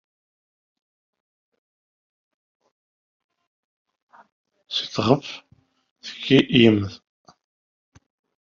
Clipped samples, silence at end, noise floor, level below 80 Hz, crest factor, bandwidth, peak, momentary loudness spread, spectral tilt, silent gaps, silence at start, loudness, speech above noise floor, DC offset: under 0.1%; 1.5 s; under -90 dBFS; -62 dBFS; 24 dB; 7.4 kHz; -2 dBFS; 21 LU; -4.5 dB/octave; 5.91-5.96 s; 4.7 s; -20 LUFS; over 71 dB; under 0.1%